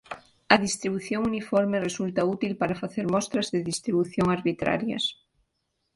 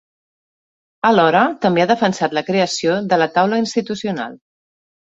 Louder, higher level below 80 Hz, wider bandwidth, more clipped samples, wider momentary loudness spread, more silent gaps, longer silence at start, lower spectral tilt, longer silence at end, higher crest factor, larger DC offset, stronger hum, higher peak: second, -26 LUFS vs -17 LUFS; about the same, -58 dBFS vs -62 dBFS; first, 11.5 kHz vs 8 kHz; neither; second, 7 LU vs 10 LU; neither; second, 0.1 s vs 1.05 s; about the same, -4.5 dB/octave vs -5 dB/octave; about the same, 0.8 s vs 0.75 s; first, 26 dB vs 16 dB; neither; neither; about the same, 0 dBFS vs -2 dBFS